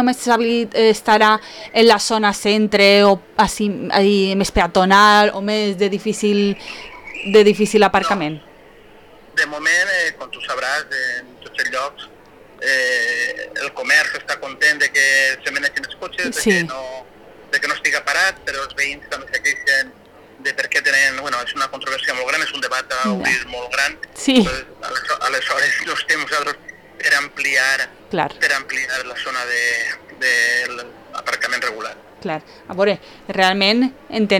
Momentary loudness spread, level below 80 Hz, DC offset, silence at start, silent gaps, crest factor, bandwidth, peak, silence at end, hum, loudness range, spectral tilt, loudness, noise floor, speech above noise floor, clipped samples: 13 LU; -46 dBFS; under 0.1%; 0 s; none; 16 dB; 18 kHz; -2 dBFS; 0 s; none; 6 LU; -3 dB/octave; -17 LUFS; -44 dBFS; 27 dB; under 0.1%